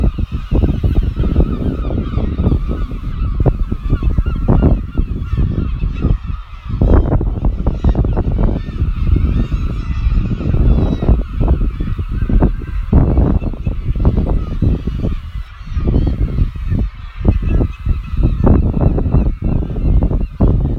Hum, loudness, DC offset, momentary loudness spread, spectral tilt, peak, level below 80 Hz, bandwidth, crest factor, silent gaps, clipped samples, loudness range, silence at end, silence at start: none; -17 LUFS; under 0.1%; 8 LU; -10.5 dB/octave; 0 dBFS; -16 dBFS; 4.7 kHz; 14 dB; none; under 0.1%; 2 LU; 0 s; 0 s